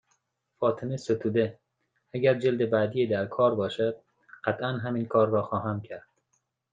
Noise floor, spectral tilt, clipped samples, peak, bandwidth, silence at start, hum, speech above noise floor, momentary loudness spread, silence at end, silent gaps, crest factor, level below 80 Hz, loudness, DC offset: -76 dBFS; -7.5 dB/octave; under 0.1%; -8 dBFS; 9 kHz; 0.6 s; none; 49 dB; 9 LU; 0.75 s; none; 20 dB; -72 dBFS; -27 LUFS; under 0.1%